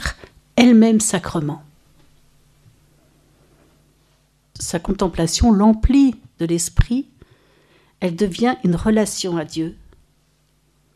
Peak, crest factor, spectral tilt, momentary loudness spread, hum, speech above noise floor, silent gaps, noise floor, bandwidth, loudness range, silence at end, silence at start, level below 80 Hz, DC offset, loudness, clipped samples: 0 dBFS; 20 dB; -5 dB/octave; 14 LU; none; 44 dB; none; -61 dBFS; 13.5 kHz; 11 LU; 1.2 s; 0 s; -32 dBFS; under 0.1%; -18 LUFS; under 0.1%